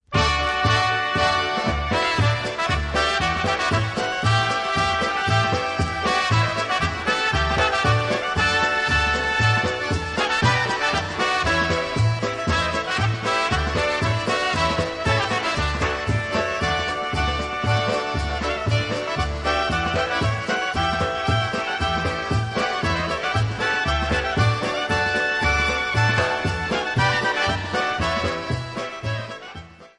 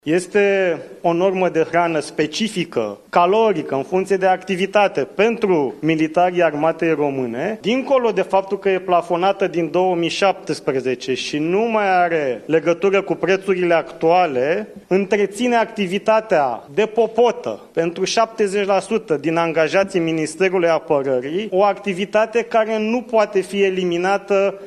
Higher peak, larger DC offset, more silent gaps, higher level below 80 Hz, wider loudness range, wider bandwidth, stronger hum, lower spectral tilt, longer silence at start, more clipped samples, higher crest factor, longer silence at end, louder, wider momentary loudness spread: second, -6 dBFS vs -2 dBFS; neither; neither; first, -36 dBFS vs -60 dBFS; about the same, 3 LU vs 1 LU; about the same, 11 kHz vs 12 kHz; neither; about the same, -4.5 dB/octave vs -5 dB/octave; about the same, 0.1 s vs 0.05 s; neither; about the same, 16 dB vs 16 dB; about the same, 0.1 s vs 0 s; second, -21 LUFS vs -18 LUFS; about the same, 5 LU vs 5 LU